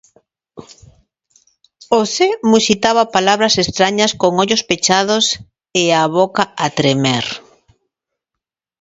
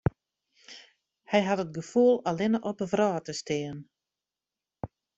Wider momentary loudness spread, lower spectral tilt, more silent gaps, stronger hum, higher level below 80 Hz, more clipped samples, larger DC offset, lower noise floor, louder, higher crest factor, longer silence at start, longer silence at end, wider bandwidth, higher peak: second, 5 LU vs 23 LU; second, -3.5 dB/octave vs -6 dB/octave; neither; neither; first, -52 dBFS vs -58 dBFS; neither; neither; second, -83 dBFS vs under -90 dBFS; first, -14 LUFS vs -28 LUFS; about the same, 16 dB vs 20 dB; first, 0.55 s vs 0.05 s; first, 1.4 s vs 0.3 s; about the same, 8 kHz vs 8.2 kHz; first, 0 dBFS vs -10 dBFS